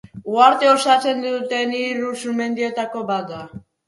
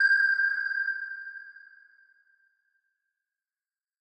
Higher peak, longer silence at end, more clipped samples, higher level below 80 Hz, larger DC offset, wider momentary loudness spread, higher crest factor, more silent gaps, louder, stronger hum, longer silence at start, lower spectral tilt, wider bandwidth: first, 0 dBFS vs -14 dBFS; second, 0.3 s vs 2.4 s; neither; first, -62 dBFS vs under -90 dBFS; neither; second, 11 LU vs 22 LU; about the same, 18 dB vs 18 dB; neither; first, -19 LUFS vs -26 LUFS; neither; first, 0.15 s vs 0 s; first, -3.5 dB/octave vs 2.5 dB/octave; first, 11.5 kHz vs 8.6 kHz